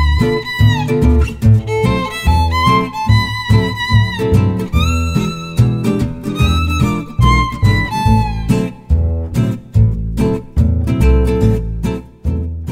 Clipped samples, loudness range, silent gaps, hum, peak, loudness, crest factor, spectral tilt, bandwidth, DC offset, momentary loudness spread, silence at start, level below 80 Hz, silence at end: under 0.1%; 2 LU; none; none; 0 dBFS; -15 LUFS; 14 dB; -7 dB/octave; 15.5 kHz; under 0.1%; 6 LU; 0 s; -20 dBFS; 0 s